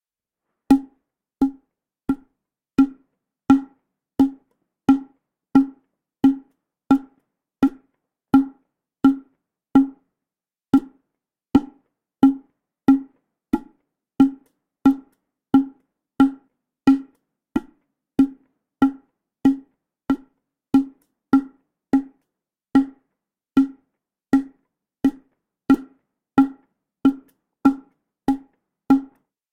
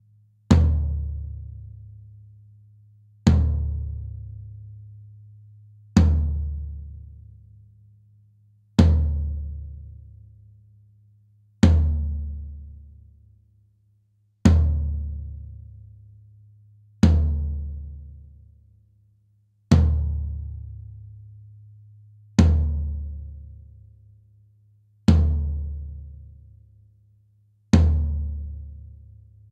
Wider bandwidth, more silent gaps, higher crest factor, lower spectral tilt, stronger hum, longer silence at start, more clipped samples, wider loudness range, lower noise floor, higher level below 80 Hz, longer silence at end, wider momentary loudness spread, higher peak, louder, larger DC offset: second, 5.6 kHz vs 8.2 kHz; neither; about the same, 20 dB vs 22 dB; about the same, -7.5 dB/octave vs -8 dB/octave; neither; first, 0.7 s vs 0.5 s; neither; about the same, 3 LU vs 3 LU; first, under -90 dBFS vs -64 dBFS; second, -52 dBFS vs -32 dBFS; second, 0.45 s vs 0.7 s; second, 11 LU vs 25 LU; about the same, -2 dBFS vs -2 dBFS; about the same, -21 LUFS vs -23 LUFS; neither